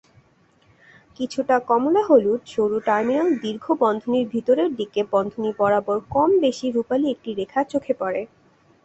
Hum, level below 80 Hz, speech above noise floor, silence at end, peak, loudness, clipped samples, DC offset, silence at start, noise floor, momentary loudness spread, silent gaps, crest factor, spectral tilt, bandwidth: none; -60 dBFS; 38 dB; 0.6 s; -4 dBFS; -21 LUFS; under 0.1%; under 0.1%; 1.2 s; -59 dBFS; 9 LU; none; 18 dB; -6 dB/octave; 8.2 kHz